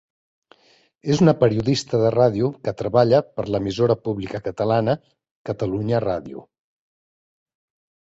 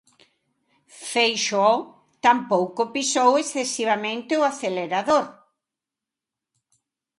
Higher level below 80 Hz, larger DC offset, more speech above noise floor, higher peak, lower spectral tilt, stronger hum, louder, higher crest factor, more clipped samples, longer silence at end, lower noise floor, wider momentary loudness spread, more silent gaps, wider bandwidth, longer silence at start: first, -52 dBFS vs -72 dBFS; neither; second, 38 dB vs 66 dB; about the same, -2 dBFS vs -4 dBFS; first, -7 dB/octave vs -2.5 dB/octave; neither; about the same, -21 LUFS vs -22 LUFS; about the same, 20 dB vs 20 dB; neither; second, 1.65 s vs 1.85 s; second, -58 dBFS vs -88 dBFS; first, 12 LU vs 7 LU; first, 5.31-5.45 s vs none; second, 8 kHz vs 11.5 kHz; about the same, 1.05 s vs 0.95 s